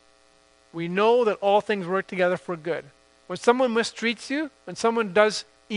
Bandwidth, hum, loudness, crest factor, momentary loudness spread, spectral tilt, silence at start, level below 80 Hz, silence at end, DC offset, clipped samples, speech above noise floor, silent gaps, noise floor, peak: 10.5 kHz; none; -24 LUFS; 22 dB; 12 LU; -4.5 dB/octave; 0.75 s; -70 dBFS; 0 s; under 0.1%; under 0.1%; 35 dB; none; -59 dBFS; -4 dBFS